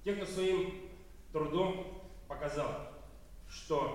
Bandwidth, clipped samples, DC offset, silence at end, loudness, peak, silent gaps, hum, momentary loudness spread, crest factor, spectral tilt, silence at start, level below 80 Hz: 16 kHz; under 0.1%; 0.1%; 0 s; -37 LUFS; -20 dBFS; none; none; 21 LU; 18 dB; -5.5 dB/octave; 0 s; -54 dBFS